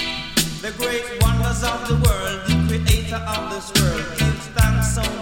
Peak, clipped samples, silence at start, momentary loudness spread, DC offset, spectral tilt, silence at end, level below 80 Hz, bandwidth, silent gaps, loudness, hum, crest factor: -4 dBFS; under 0.1%; 0 s; 6 LU; under 0.1%; -4.5 dB/octave; 0 s; -26 dBFS; 17 kHz; none; -20 LUFS; none; 16 dB